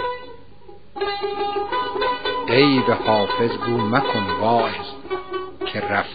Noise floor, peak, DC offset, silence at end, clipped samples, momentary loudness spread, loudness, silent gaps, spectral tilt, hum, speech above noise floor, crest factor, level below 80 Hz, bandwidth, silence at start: -46 dBFS; -2 dBFS; 1%; 0 s; under 0.1%; 13 LU; -21 LUFS; none; -3 dB/octave; none; 27 dB; 20 dB; -52 dBFS; 5 kHz; 0 s